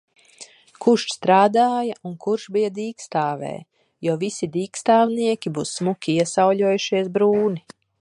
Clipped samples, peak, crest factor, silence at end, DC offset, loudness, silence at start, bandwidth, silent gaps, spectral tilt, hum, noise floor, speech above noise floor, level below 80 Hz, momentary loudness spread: under 0.1%; -4 dBFS; 18 dB; 0.4 s; under 0.1%; -21 LUFS; 0.4 s; 11.5 kHz; none; -5 dB/octave; none; -46 dBFS; 26 dB; -68 dBFS; 11 LU